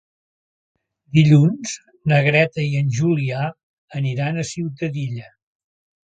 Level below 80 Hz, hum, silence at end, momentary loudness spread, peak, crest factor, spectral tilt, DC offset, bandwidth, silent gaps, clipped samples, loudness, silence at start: -58 dBFS; none; 0.95 s; 14 LU; -2 dBFS; 18 dB; -6.5 dB/octave; under 0.1%; 9 kHz; 3.63-3.88 s; under 0.1%; -19 LUFS; 1.15 s